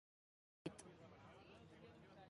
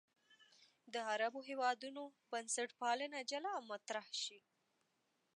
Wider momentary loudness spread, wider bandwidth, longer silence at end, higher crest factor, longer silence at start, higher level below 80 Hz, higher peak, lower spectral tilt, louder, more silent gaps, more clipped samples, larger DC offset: about the same, 8 LU vs 7 LU; about the same, 10.5 kHz vs 11 kHz; second, 0 s vs 1 s; first, 26 dB vs 20 dB; first, 0.65 s vs 0.3 s; first, -80 dBFS vs under -90 dBFS; second, -36 dBFS vs -24 dBFS; first, -5 dB/octave vs -0.5 dB/octave; second, -60 LUFS vs -43 LUFS; neither; neither; neither